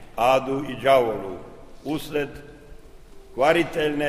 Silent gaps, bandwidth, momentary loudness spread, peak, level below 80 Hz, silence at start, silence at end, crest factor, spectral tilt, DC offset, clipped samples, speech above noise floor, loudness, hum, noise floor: none; 15.5 kHz; 18 LU; -6 dBFS; -46 dBFS; 0 s; 0 s; 18 dB; -5 dB/octave; under 0.1%; under 0.1%; 22 dB; -23 LUFS; none; -44 dBFS